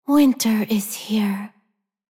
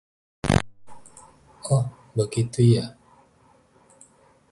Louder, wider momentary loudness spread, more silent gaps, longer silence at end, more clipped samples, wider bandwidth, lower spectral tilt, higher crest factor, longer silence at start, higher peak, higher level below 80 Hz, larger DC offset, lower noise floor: first, -21 LUFS vs -24 LUFS; second, 12 LU vs 17 LU; neither; second, 0.7 s vs 1.6 s; neither; first, 17 kHz vs 11.5 kHz; second, -4.5 dB/octave vs -6.5 dB/octave; second, 14 dB vs 24 dB; second, 0.1 s vs 0.45 s; second, -6 dBFS vs -2 dBFS; second, -64 dBFS vs -46 dBFS; neither; first, -70 dBFS vs -58 dBFS